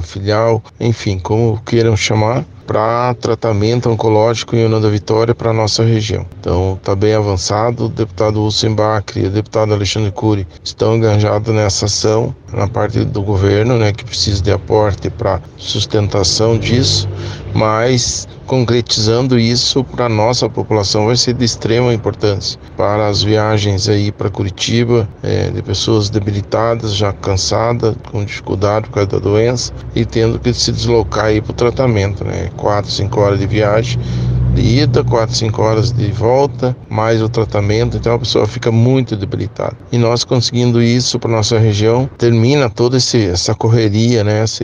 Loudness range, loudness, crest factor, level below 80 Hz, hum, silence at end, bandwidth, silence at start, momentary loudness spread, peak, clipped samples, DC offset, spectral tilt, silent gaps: 2 LU; -14 LUFS; 14 dB; -34 dBFS; none; 0 s; 9.8 kHz; 0 s; 6 LU; 0 dBFS; under 0.1%; under 0.1%; -5.5 dB/octave; none